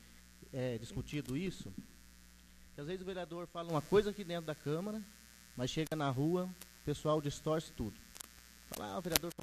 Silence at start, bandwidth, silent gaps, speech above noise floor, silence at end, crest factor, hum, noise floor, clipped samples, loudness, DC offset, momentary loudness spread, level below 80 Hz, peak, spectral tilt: 0 s; 14 kHz; none; 22 dB; 0.1 s; 32 dB; none; -60 dBFS; under 0.1%; -39 LUFS; under 0.1%; 18 LU; -58 dBFS; -8 dBFS; -5 dB/octave